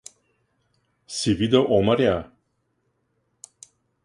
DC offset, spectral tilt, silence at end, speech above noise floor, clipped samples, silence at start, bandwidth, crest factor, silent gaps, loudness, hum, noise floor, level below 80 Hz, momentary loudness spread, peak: under 0.1%; -5.5 dB/octave; 1.8 s; 52 dB; under 0.1%; 1.1 s; 11.5 kHz; 22 dB; none; -21 LUFS; none; -72 dBFS; -50 dBFS; 10 LU; -4 dBFS